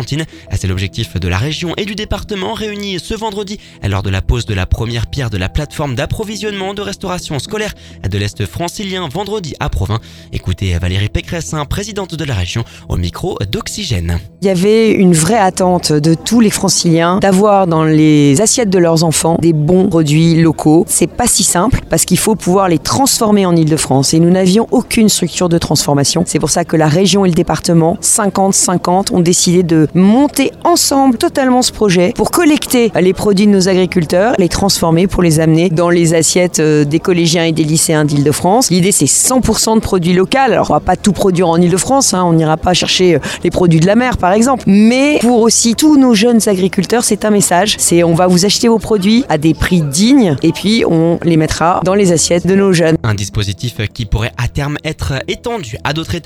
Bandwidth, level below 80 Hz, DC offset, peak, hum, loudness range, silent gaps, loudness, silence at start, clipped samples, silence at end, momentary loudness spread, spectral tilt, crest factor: 16 kHz; -30 dBFS; under 0.1%; 0 dBFS; none; 9 LU; none; -11 LUFS; 0 s; under 0.1%; 0.05 s; 10 LU; -4.5 dB/octave; 12 dB